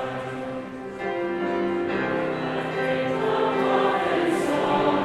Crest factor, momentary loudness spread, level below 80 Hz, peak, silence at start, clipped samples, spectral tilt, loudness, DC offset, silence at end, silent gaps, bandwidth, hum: 16 dB; 10 LU; -58 dBFS; -10 dBFS; 0 s; under 0.1%; -6 dB/octave; -25 LUFS; under 0.1%; 0 s; none; 13.5 kHz; none